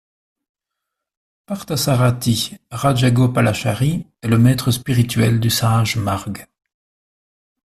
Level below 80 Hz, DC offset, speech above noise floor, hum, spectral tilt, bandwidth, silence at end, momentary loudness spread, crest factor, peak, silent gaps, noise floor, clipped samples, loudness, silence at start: -46 dBFS; under 0.1%; 64 dB; none; -5.5 dB/octave; 14 kHz; 1.25 s; 10 LU; 16 dB; -2 dBFS; none; -81 dBFS; under 0.1%; -17 LUFS; 1.5 s